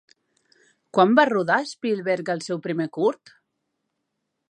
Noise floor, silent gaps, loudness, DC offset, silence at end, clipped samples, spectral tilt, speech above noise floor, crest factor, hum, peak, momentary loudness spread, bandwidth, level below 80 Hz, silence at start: -79 dBFS; none; -22 LUFS; under 0.1%; 1.35 s; under 0.1%; -5.5 dB/octave; 57 dB; 22 dB; none; -2 dBFS; 11 LU; 10.5 kHz; -78 dBFS; 0.95 s